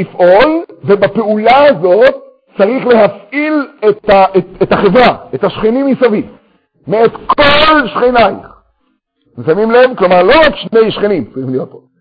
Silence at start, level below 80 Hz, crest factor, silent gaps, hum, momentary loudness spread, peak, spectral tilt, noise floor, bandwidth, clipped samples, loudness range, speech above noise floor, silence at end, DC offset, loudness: 0 s; -40 dBFS; 10 dB; none; none; 11 LU; 0 dBFS; -7.5 dB/octave; -60 dBFS; 5.2 kHz; 0.1%; 2 LU; 52 dB; 0.25 s; under 0.1%; -9 LUFS